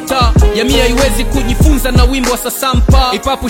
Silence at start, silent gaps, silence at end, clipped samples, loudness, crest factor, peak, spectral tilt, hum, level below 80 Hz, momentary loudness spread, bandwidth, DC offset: 0 s; none; 0 s; 0.2%; -11 LUFS; 10 dB; 0 dBFS; -5 dB/octave; none; -14 dBFS; 4 LU; 17 kHz; under 0.1%